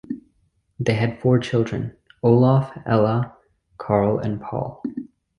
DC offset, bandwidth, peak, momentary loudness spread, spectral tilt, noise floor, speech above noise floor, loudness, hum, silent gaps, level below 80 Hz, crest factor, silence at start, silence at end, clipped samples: under 0.1%; 9.2 kHz; -2 dBFS; 16 LU; -8.5 dB/octave; -65 dBFS; 46 dB; -21 LUFS; none; none; -52 dBFS; 18 dB; 0.1 s; 0.3 s; under 0.1%